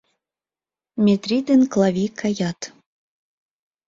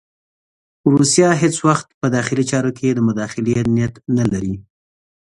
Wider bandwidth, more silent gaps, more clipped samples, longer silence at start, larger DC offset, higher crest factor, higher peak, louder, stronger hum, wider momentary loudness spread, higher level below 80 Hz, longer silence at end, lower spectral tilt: second, 7.6 kHz vs 11.5 kHz; second, none vs 1.94-2.01 s; neither; about the same, 0.95 s vs 0.85 s; neither; about the same, 16 dB vs 18 dB; second, -6 dBFS vs 0 dBFS; second, -20 LUFS vs -17 LUFS; neither; first, 17 LU vs 8 LU; second, -62 dBFS vs -46 dBFS; first, 1.2 s vs 0.6 s; about the same, -6 dB/octave vs -5.5 dB/octave